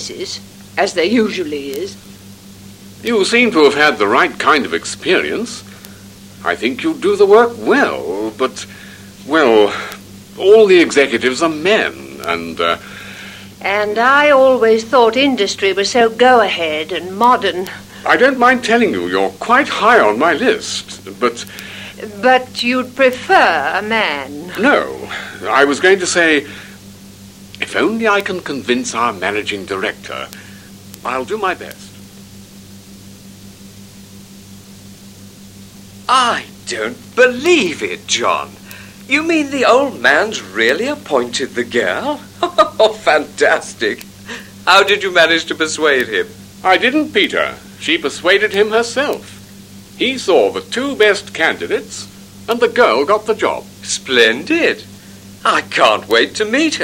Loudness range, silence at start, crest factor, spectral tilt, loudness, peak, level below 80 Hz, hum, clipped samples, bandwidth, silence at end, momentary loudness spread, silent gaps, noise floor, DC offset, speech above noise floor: 6 LU; 0 s; 16 dB; -3 dB/octave; -14 LUFS; 0 dBFS; -54 dBFS; 50 Hz at -45 dBFS; under 0.1%; 16.5 kHz; 0 s; 16 LU; none; -37 dBFS; under 0.1%; 23 dB